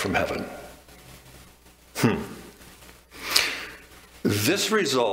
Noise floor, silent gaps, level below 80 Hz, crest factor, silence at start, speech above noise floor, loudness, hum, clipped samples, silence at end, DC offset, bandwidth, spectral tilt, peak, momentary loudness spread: -53 dBFS; none; -52 dBFS; 26 dB; 0 s; 28 dB; -24 LUFS; 60 Hz at -55 dBFS; under 0.1%; 0 s; under 0.1%; 16 kHz; -3.5 dB/octave; -2 dBFS; 25 LU